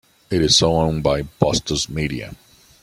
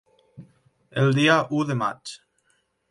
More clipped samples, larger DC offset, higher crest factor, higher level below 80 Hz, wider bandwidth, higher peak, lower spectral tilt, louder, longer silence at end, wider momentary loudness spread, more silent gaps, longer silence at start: neither; neither; about the same, 18 dB vs 20 dB; first, -38 dBFS vs -66 dBFS; first, 16 kHz vs 11.5 kHz; first, -2 dBFS vs -6 dBFS; second, -4 dB/octave vs -6 dB/octave; first, -19 LUFS vs -22 LUFS; second, 0.5 s vs 0.75 s; second, 11 LU vs 20 LU; neither; about the same, 0.3 s vs 0.4 s